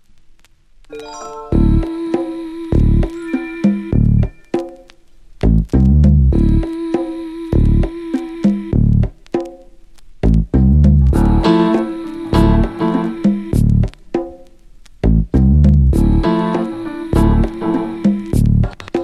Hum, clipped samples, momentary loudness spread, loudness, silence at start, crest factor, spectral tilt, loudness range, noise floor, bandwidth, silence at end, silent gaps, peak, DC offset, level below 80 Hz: none; under 0.1%; 12 LU; -15 LUFS; 0.9 s; 14 dB; -9 dB/octave; 4 LU; -45 dBFS; 12 kHz; 0 s; none; 0 dBFS; under 0.1%; -20 dBFS